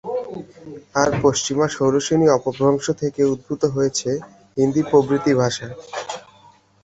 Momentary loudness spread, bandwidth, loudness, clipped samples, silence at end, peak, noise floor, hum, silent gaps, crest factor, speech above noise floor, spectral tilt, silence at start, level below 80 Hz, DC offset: 14 LU; 8 kHz; -20 LUFS; under 0.1%; 0.65 s; -2 dBFS; -51 dBFS; none; none; 18 dB; 32 dB; -5 dB/octave; 0.05 s; -52 dBFS; under 0.1%